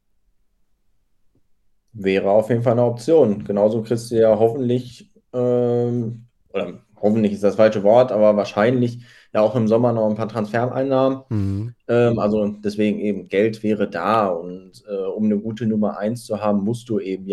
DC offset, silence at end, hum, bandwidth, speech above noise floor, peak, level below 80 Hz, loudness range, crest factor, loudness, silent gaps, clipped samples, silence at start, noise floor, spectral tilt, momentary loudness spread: under 0.1%; 0 s; none; 12.5 kHz; 43 dB; -2 dBFS; -60 dBFS; 4 LU; 18 dB; -19 LUFS; none; under 0.1%; 1.95 s; -62 dBFS; -7.5 dB/octave; 11 LU